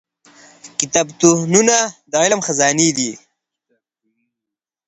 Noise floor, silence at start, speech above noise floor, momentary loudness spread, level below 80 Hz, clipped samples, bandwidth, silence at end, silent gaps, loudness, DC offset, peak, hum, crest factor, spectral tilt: -85 dBFS; 0.65 s; 69 dB; 10 LU; -62 dBFS; under 0.1%; 9 kHz; 1.7 s; none; -15 LUFS; under 0.1%; 0 dBFS; none; 18 dB; -3 dB/octave